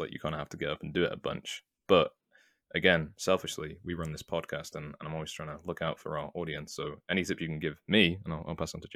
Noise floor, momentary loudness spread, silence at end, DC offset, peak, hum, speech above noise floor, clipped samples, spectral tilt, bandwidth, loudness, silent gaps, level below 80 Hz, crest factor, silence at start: -67 dBFS; 13 LU; 0 s; under 0.1%; -8 dBFS; none; 35 dB; under 0.1%; -4.5 dB/octave; 15.5 kHz; -32 LUFS; none; -60 dBFS; 24 dB; 0 s